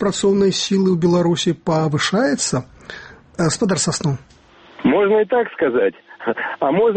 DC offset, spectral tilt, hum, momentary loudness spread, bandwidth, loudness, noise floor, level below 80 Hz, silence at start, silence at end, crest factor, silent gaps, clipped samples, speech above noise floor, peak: under 0.1%; -5 dB/octave; none; 12 LU; 8.8 kHz; -18 LUFS; -47 dBFS; -52 dBFS; 0 s; 0 s; 14 dB; none; under 0.1%; 30 dB; -4 dBFS